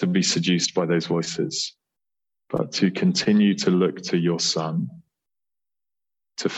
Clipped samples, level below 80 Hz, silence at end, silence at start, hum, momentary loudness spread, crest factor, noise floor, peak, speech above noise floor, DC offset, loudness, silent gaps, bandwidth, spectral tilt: under 0.1%; -66 dBFS; 0 s; 0 s; none; 10 LU; 18 dB; under -90 dBFS; -6 dBFS; over 68 dB; under 0.1%; -22 LUFS; none; 8.4 kHz; -4.5 dB/octave